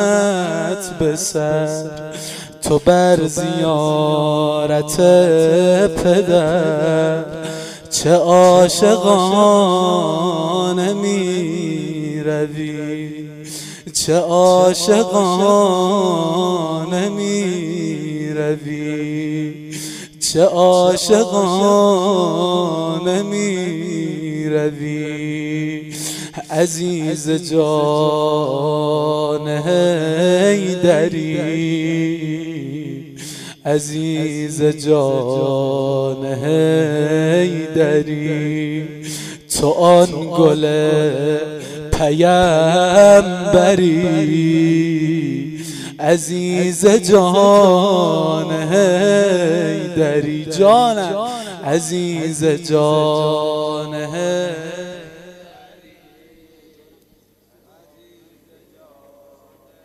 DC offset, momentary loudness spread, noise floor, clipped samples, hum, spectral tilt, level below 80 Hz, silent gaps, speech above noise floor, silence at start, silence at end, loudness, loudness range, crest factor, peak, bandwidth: under 0.1%; 13 LU; -56 dBFS; under 0.1%; none; -5 dB/octave; -46 dBFS; none; 41 dB; 0 s; 4.5 s; -15 LUFS; 8 LU; 14 dB; -2 dBFS; 16 kHz